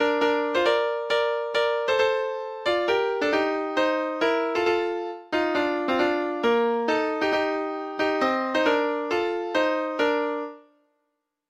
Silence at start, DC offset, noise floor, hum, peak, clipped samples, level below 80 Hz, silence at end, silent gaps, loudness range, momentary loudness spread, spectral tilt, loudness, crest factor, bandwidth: 0 s; under 0.1%; -78 dBFS; none; -8 dBFS; under 0.1%; -64 dBFS; 0.9 s; none; 1 LU; 5 LU; -4 dB/octave; -24 LUFS; 16 dB; 11 kHz